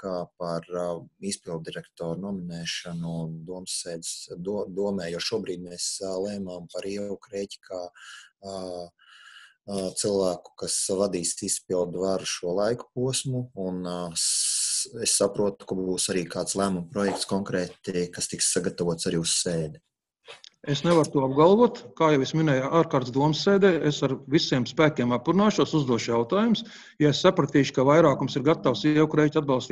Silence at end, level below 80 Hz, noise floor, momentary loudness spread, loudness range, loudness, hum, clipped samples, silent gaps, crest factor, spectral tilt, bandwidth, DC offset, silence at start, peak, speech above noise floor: 0 s; -60 dBFS; -51 dBFS; 14 LU; 10 LU; -25 LUFS; none; under 0.1%; none; 20 dB; -4.5 dB/octave; 13 kHz; under 0.1%; 0 s; -6 dBFS; 26 dB